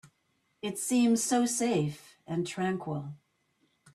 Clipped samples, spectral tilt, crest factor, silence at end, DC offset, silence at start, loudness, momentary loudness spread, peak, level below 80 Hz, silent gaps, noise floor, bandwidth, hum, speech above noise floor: under 0.1%; -4.5 dB/octave; 16 dB; 0.8 s; under 0.1%; 0.05 s; -30 LUFS; 14 LU; -16 dBFS; -72 dBFS; none; -75 dBFS; 14 kHz; none; 46 dB